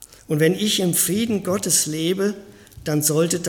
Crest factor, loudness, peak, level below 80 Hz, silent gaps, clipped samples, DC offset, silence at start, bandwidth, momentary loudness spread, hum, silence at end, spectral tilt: 18 dB; -20 LUFS; -4 dBFS; -54 dBFS; none; under 0.1%; under 0.1%; 0 s; 17.5 kHz; 8 LU; none; 0 s; -3.5 dB/octave